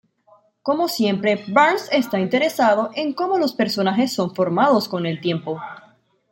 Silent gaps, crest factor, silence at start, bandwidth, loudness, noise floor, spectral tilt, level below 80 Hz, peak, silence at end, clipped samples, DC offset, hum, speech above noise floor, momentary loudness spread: none; 18 dB; 0.65 s; 17 kHz; -20 LUFS; -56 dBFS; -5.5 dB/octave; -68 dBFS; -4 dBFS; 0.55 s; under 0.1%; under 0.1%; none; 37 dB; 8 LU